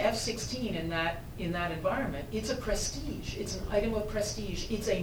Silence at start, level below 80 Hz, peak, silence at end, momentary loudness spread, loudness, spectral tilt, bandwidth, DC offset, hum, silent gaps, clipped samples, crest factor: 0 s; -42 dBFS; -16 dBFS; 0 s; 6 LU; -33 LUFS; -4 dB/octave; over 20 kHz; under 0.1%; none; none; under 0.1%; 18 dB